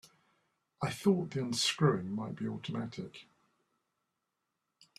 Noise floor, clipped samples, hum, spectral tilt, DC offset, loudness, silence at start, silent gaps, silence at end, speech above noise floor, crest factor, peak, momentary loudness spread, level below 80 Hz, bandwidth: -86 dBFS; under 0.1%; none; -5 dB/octave; under 0.1%; -34 LUFS; 0.8 s; none; 1.75 s; 52 dB; 22 dB; -14 dBFS; 14 LU; -72 dBFS; 14 kHz